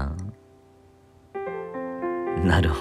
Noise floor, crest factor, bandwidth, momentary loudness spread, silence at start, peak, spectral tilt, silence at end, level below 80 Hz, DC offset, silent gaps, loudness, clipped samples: -54 dBFS; 20 dB; 12 kHz; 16 LU; 0 s; -8 dBFS; -7 dB/octave; 0 s; -36 dBFS; under 0.1%; none; -27 LUFS; under 0.1%